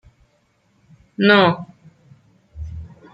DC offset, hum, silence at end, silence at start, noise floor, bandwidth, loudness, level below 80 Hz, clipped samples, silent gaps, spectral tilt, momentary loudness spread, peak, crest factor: under 0.1%; none; 0.25 s; 1.2 s; -62 dBFS; 7.6 kHz; -16 LUFS; -46 dBFS; under 0.1%; none; -7.5 dB/octave; 25 LU; -2 dBFS; 20 dB